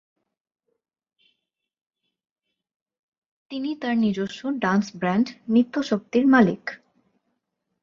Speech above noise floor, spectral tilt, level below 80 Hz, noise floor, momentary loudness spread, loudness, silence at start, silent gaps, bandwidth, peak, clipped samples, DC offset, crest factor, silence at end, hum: 57 dB; -6.5 dB/octave; -66 dBFS; -79 dBFS; 13 LU; -23 LUFS; 3.5 s; none; 7.4 kHz; -4 dBFS; under 0.1%; under 0.1%; 22 dB; 1.05 s; none